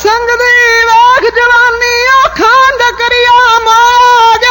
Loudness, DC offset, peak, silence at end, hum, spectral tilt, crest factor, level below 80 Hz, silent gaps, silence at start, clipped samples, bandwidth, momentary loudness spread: -5 LUFS; under 0.1%; 0 dBFS; 0 s; none; -1 dB/octave; 6 dB; -36 dBFS; none; 0 s; under 0.1%; 17 kHz; 4 LU